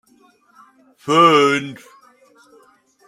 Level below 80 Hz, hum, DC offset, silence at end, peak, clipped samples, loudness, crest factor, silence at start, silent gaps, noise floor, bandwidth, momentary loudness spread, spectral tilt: -70 dBFS; none; under 0.1%; 1.35 s; -2 dBFS; under 0.1%; -14 LUFS; 18 dB; 1.05 s; none; -55 dBFS; 14.5 kHz; 22 LU; -4.5 dB/octave